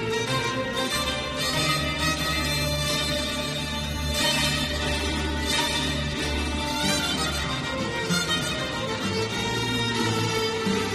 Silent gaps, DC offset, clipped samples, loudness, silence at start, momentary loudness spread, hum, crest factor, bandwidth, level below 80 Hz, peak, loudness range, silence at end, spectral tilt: none; under 0.1%; under 0.1%; -25 LUFS; 0 s; 5 LU; none; 16 dB; 13 kHz; -38 dBFS; -10 dBFS; 1 LU; 0 s; -3.5 dB/octave